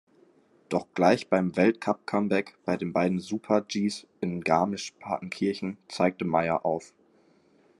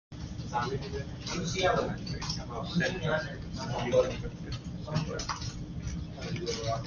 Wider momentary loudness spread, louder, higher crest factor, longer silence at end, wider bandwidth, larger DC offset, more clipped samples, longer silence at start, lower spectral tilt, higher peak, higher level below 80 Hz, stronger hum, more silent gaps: about the same, 10 LU vs 11 LU; first, -28 LUFS vs -33 LUFS; about the same, 20 dB vs 20 dB; first, 0.95 s vs 0 s; first, 12 kHz vs 7.2 kHz; neither; neither; first, 0.7 s vs 0.1 s; about the same, -6 dB/octave vs -5 dB/octave; first, -8 dBFS vs -14 dBFS; second, -70 dBFS vs -46 dBFS; neither; neither